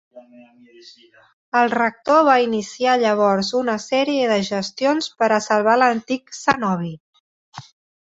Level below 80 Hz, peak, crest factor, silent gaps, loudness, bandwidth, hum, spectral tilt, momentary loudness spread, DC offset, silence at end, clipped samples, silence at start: -62 dBFS; -2 dBFS; 18 dB; 1.33-1.52 s, 7.00-7.13 s, 7.20-7.52 s; -19 LUFS; 8 kHz; none; -4.5 dB/octave; 7 LU; under 0.1%; 0.5 s; under 0.1%; 0.15 s